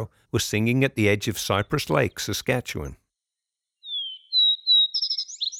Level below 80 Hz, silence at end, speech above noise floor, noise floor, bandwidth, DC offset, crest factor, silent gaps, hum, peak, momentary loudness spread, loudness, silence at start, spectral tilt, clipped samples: -50 dBFS; 0 s; 62 dB; -86 dBFS; 19.5 kHz; under 0.1%; 18 dB; none; none; -6 dBFS; 13 LU; -22 LUFS; 0 s; -4 dB/octave; under 0.1%